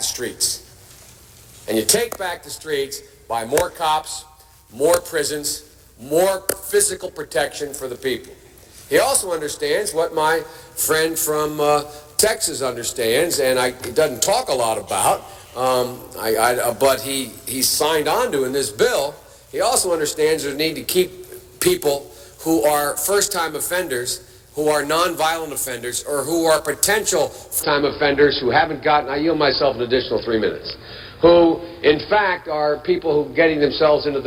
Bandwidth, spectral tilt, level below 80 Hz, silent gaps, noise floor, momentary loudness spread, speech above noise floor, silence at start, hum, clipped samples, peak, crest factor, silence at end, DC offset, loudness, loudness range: 18 kHz; -2.5 dB/octave; -48 dBFS; none; -45 dBFS; 10 LU; 26 dB; 0 s; none; under 0.1%; -2 dBFS; 18 dB; 0 s; under 0.1%; -19 LUFS; 4 LU